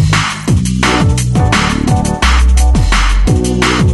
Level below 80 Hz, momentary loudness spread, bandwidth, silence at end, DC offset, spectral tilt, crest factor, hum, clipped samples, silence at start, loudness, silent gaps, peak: -14 dBFS; 3 LU; 12 kHz; 0 s; under 0.1%; -5 dB/octave; 10 dB; none; under 0.1%; 0 s; -11 LUFS; none; 0 dBFS